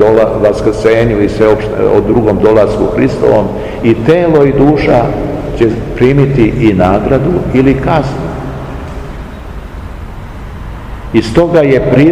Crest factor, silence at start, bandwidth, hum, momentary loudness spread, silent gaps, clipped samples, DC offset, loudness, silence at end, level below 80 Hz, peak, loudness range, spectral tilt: 10 dB; 0 s; 11.5 kHz; none; 18 LU; none; 3%; 0.8%; -9 LUFS; 0 s; -26 dBFS; 0 dBFS; 7 LU; -8 dB/octave